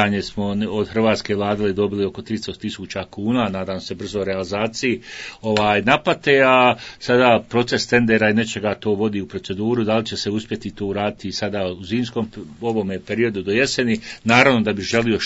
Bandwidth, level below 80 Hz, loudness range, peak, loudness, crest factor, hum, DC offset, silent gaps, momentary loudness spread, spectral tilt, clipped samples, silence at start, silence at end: 8 kHz; -50 dBFS; 7 LU; 0 dBFS; -20 LUFS; 20 dB; none; under 0.1%; none; 12 LU; -5 dB/octave; under 0.1%; 0 s; 0 s